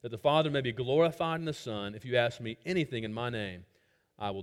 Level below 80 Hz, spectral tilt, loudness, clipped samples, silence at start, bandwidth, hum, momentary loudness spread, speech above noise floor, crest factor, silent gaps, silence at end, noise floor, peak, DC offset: -64 dBFS; -6 dB/octave; -32 LUFS; under 0.1%; 0.05 s; 15.5 kHz; none; 11 LU; 25 dB; 20 dB; none; 0 s; -56 dBFS; -12 dBFS; under 0.1%